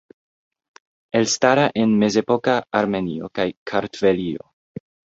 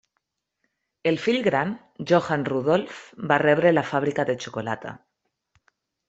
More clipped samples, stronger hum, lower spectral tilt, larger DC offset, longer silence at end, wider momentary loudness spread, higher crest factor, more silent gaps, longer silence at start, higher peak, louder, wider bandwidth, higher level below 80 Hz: neither; neither; second, -4.5 dB/octave vs -6 dB/octave; neither; second, 0.75 s vs 1.1 s; first, 18 LU vs 13 LU; about the same, 20 dB vs 22 dB; first, 3.57-3.66 s vs none; about the same, 1.15 s vs 1.05 s; about the same, -2 dBFS vs -4 dBFS; first, -20 LUFS vs -23 LUFS; about the same, 8 kHz vs 8 kHz; first, -56 dBFS vs -66 dBFS